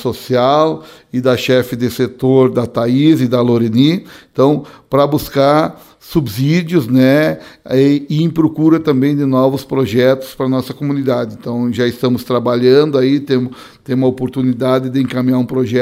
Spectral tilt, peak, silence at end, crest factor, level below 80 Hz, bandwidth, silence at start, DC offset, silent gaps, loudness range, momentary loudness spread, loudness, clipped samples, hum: -7.5 dB/octave; 0 dBFS; 0 s; 14 dB; -48 dBFS; 16 kHz; 0 s; under 0.1%; none; 2 LU; 7 LU; -14 LUFS; under 0.1%; none